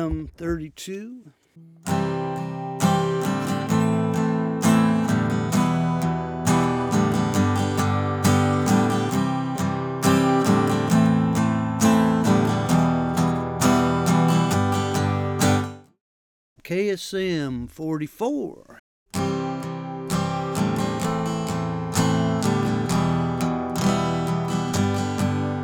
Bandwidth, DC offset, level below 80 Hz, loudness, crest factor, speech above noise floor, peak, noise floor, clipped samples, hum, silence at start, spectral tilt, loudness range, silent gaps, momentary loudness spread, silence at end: over 20 kHz; under 0.1%; -48 dBFS; -22 LUFS; 18 dB; over 63 dB; -4 dBFS; under -90 dBFS; under 0.1%; none; 0 s; -6 dB/octave; 7 LU; 16.01-16.56 s, 18.79-19.06 s; 10 LU; 0 s